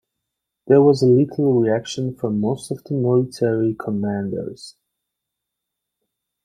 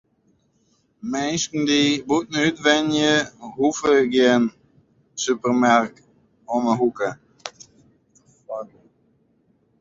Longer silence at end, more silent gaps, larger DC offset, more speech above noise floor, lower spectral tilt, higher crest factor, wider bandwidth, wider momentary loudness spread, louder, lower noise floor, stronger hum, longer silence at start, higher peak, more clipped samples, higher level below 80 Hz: first, 1.75 s vs 1.15 s; neither; neither; first, 63 dB vs 45 dB; first, -7.5 dB/octave vs -3.5 dB/octave; about the same, 18 dB vs 20 dB; first, 11 kHz vs 7.8 kHz; second, 13 LU vs 18 LU; about the same, -19 LUFS vs -20 LUFS; first, -82 dBFS vs -64 dBFS; neither; second, 0.65 s vs 1.05 s; about the same, -2 dBFS vs -2 dBFS; neither; about the same, -60 dBFS vs -62 dBFS